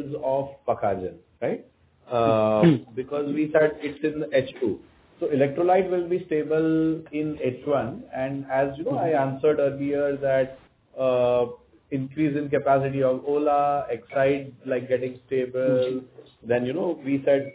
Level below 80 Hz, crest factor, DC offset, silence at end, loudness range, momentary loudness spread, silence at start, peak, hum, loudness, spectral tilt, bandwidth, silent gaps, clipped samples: -58 dBFS; 18 dB; under 0.1%; 0 s; 2 LU; 9 LU; 0 s; -6 dBFS; none; -25 LUFS; -11 dB/octave; 4 kHz; none; under 0.1%